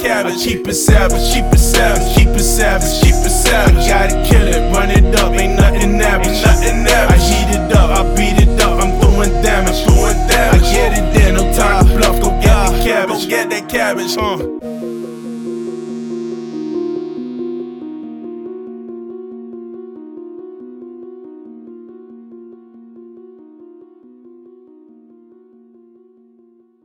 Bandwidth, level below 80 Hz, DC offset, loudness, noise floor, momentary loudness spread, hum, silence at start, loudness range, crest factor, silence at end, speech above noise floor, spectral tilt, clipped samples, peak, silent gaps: 19 kHz; -16 dBFS; under 0.1%; -13 LUFS; -50 dBFS; 19 LU; none; 0 s; 19 LU; 12 dB; 3.85 s; 40 dB; -4.5 dB/octave; under 0.1%; 0 dBFS; none